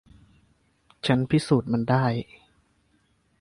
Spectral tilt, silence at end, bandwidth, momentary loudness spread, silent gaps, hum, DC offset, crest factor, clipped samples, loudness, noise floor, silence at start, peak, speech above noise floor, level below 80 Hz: -7 dB/octave; 1.15 s; 11.5 kHz; 10 LU; none; none; under 0.1%; 20 dB; under 0.1%; -24 LUFS; -67 dBFS; 1.05 s; -6 dBFS; 44 dB; -56 dBFS